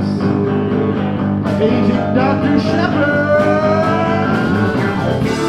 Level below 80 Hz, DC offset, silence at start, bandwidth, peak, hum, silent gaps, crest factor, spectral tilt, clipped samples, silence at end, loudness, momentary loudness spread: -40 dBFS; under 0.1%; 0 s; 11 kHz; -2 dBFS; none; none; 12 dB; -7.5 dB/octave; under 0.1%; 0 s; -15 LUFS; 4 LU